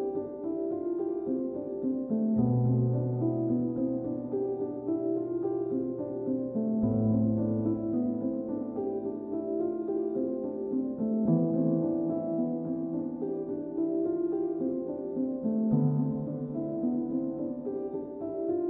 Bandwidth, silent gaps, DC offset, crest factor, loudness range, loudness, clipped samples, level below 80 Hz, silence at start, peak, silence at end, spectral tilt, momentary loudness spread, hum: 1.9 kHz; none; under 0.1%; 14 dB; 2 LU; -31 LUFS; under 0.1%; -62 dBFS; 0 s; -16 dBFS; 0 s; -14.5 dB/octave; 8 LU; none